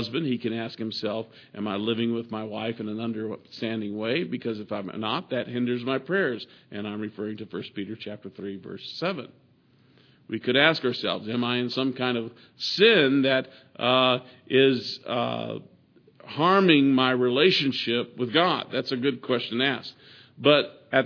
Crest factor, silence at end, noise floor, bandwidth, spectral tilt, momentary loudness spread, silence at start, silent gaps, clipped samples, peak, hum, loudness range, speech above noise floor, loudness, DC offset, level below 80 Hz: 22 dB; 0 s; -60 dBFS; 5.4 kHz; -6 dB/octave; 16 LU; 0 s; none; under 0.1%; -4 dBFS; none; 9 LU; 35 dB; -25 LUFS; under 0.1%; -76 dBFS